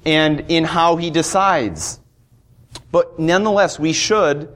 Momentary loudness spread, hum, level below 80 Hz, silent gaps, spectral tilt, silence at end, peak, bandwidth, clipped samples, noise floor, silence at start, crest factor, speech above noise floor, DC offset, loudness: 7 LU; none; -46 dBFS; none; -4 dB/octave; 0.05 s; -2 dBFS; 15.5 kHz; under 0.1%; -53 dBFS; 0.05 s; 14 dB; 36 dB; under 0.1%; -17 LUFS